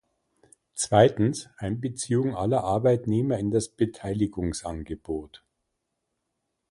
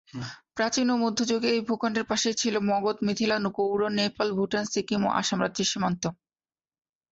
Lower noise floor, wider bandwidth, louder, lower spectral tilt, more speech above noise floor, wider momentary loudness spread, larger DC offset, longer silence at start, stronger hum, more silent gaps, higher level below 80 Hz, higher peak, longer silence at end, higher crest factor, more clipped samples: second, -80 dBFS vs under -90 dBFS; first, 11.5 kHz vs 8 kHz; about the same, -26 LUFS vs -26 LUFS; first, -6 dB/octave vs -4 dB/octave; second, 55 dB vs over 63 dB; first, 14 LU vs 4 LU; neither; first, 0.75 s vs 0.15 s; neither; neither; first, -50 dBFS vs -64 dBFS; first, -4 dBFS vs -10 dBFS; first, 1.45 s vs 1 s; first, 24 dB vs 16 dB; neither